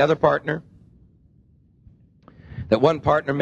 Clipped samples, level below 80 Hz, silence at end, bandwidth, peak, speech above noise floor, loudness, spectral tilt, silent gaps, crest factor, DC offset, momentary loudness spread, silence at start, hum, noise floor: under 0.1%; -48 dBFS; 0 s; 8.6 kHz; -2 dBFS; 37 dB; -21 LUFS; -7.5 dB/octave; none; 22 dB; under 0.1%; 17 LU; 0 s; none; -56 dBFS